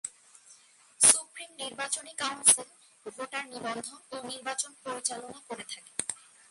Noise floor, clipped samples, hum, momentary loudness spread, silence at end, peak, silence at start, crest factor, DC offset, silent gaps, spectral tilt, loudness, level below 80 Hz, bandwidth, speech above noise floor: -59 dBFS; under 0.1%; none; 21 LU; 0.35 s; -6 dBFS; 0.05 s; 26 dB; under 0.1%; none; 0.5 dB/octave; -27 LUFS; -78 dBFS; 12 kHz; 25 dB